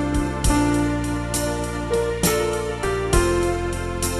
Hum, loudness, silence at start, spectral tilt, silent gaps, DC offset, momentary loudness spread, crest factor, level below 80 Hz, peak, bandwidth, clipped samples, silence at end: none; -22 LUFS; 0 s; -5 dB/octave; none; under 0.1%; 5 LU; 16 dB; -30 dBFS; -6 dBFS; 15.5 kHz; under 0.1%; 0 s